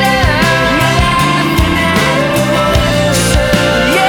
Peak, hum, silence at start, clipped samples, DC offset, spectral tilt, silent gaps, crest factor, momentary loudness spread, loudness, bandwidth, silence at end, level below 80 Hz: 0 dBFS; none; 0 s; under 0.1%; under 0.1%; -4.5 dB/octave; none; 10 dB; 1 LU; -10 LUFS; over 20 kHz; 0 s; -22 dBFS